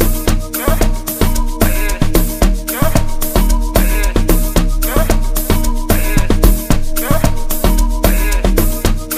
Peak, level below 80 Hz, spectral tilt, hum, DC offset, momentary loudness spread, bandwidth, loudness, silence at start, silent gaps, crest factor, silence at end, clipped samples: 0 dBFS; -14 dBFS; -5 dB/octave; none; under 0.1%; 3 LU; 15.5 kHz; -16 LUFS; 0 s; none; 12 dB; 0 s; under 0.1%